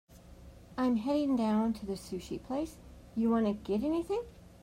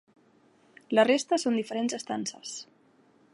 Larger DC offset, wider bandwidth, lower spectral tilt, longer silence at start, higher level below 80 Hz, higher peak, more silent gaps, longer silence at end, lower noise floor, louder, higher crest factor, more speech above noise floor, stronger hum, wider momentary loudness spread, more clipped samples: neither; first, 15 kHz vs 11.5 kHz; first, -7 dB/octave vs -3.5 dB/octave; second, 0.1 s vs 0.9 s; first, -56 dBFS vs -80 dBFS; second, -20 dBFS vs -8 dBFS; neither; second, 0.15 s vs 0.7 s; second, -53 dBFS vs -63 dBFS; second, -33 LUFS vs -28 LUFS; second, 12 dB vs 22 dB; second, 21 dB vs 35 dB; neither; second, 12 LU vs 16 LU; neither